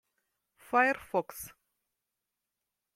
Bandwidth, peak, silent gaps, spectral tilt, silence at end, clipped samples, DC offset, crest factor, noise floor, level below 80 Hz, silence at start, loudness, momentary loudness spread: 16.5 kHz; -10 dBFS; none; -4 dB/octave; 1.45 s; under 0.1%; under 0.1%; 24 dB; -87 dBFS; -72 dBFS; 0.7 s; -30 LUFS; 18 LU